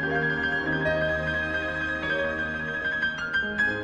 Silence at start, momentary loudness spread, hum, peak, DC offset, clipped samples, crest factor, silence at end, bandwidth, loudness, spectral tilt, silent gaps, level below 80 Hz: 0 s; 3 LU; none; -14 dBFS; under 0.1%; under 0.1%; 14 dB; 0 s; 9.6 kHz; -26 LUFS; -5.5 dB/octave; none; -46 dBFS